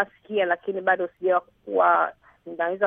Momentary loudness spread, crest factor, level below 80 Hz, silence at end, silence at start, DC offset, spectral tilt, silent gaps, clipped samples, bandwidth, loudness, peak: 9 LU; 18 dB; -72 dBFS; 0 s; 0 s; under 0.1%; -8 dB/octave; none; under 0.1%; 3.8 kHz; -24 LUFS; -8 dBFS